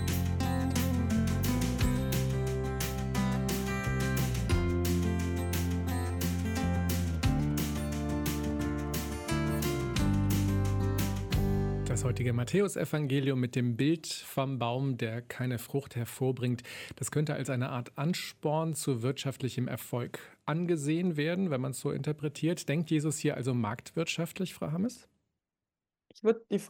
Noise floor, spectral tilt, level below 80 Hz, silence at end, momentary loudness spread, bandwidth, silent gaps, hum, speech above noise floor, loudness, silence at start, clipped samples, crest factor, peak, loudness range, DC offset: under -90 dBFS; -6 dB/octave; -42 dBFS; 0 s; 6 LU; 17.5 kHz; none; none; over 58 dB; -32 LUFS; 0 s; under 0.1%; 16 dB; -14 dBFS; 3 LU; under 0.1%